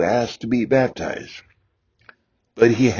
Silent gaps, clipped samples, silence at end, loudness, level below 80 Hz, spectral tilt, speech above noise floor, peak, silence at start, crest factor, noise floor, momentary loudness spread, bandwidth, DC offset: none; under 0.1%; 0 s; -20 LUFS; -50 dBFS; -6.5 dB/octave; 46 dB; -2 dBFS; 0 s; 18 dB; -65 dBFS; 17 LU; 7.2 kHz; under 0.1%